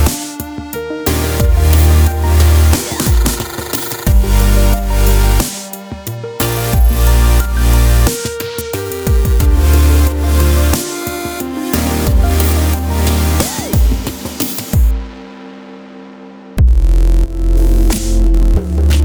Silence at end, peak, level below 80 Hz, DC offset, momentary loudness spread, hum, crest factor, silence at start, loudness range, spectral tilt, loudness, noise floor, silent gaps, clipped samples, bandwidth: 0 s; 0 dBFS; -12 dBFS; under 0.1%; 13 LU; none; 12 dB; 0 s; 4 LU; -5 dB/octave; -14 LUFS; -33 dBFS; none; under 0.1%; over 20 kHz